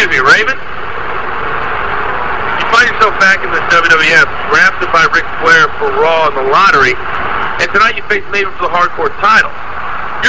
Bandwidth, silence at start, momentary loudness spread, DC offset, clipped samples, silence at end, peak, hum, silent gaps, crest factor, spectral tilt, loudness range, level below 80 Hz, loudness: 8 kHz; 0 s; 11 LU; 10%; 0.9%; 0 s; 0 dBFS; none; none; 12 dB; -3 dB/octave; 4 LU; -36 dBFS; -10 LUFS